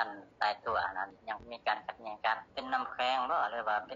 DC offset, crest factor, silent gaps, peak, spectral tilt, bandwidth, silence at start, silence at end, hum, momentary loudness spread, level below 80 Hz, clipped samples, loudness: under 0.1%; 18 dB; none; -16 dBFS; 0.5 dB/octave; 7.4 kHz; 0 s; 0 s; none; 8 LU; -68 dBFS; under 0.1%; -35 LUFS